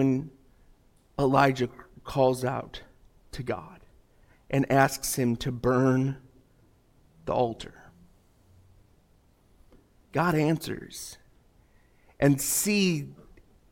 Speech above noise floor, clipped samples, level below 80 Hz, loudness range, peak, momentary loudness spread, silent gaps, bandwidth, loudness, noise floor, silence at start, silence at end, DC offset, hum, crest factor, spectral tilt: 36 dB; under 0.1%; -54 dBFS; 9 LU; -8 dBFS; 19 LU; none; 16.5 kHz; -27 LUFS; -62 dBFS; 0 s; 0.6 s; under 0.1%; none; 22 dB; -5 dB/octave